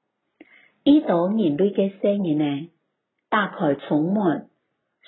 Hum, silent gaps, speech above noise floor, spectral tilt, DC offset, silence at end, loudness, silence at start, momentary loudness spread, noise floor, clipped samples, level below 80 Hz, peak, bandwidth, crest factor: none; none; 56 dB; -11.5 dB/octave; under 0.1%; 0.65 s; -22 LUFS; 0.85 s; 7 LU; -76 dBFS; under 0.1%; -68 dBFS; -6 dBFS; 4.2 kHz; 18 dB